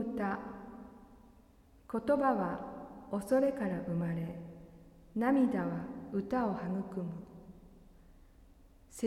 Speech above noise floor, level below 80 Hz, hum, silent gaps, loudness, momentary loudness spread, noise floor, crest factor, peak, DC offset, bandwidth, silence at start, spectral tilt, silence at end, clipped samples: 29 dB; -62 dBFS; none; none; -35 LUFS; 22 LU; -62 dBFS; 20 dB; -16 dBFS; under 0.1%; 13.5 kHz; 0 s; -8 dB/octave; 0 s; under 0.1%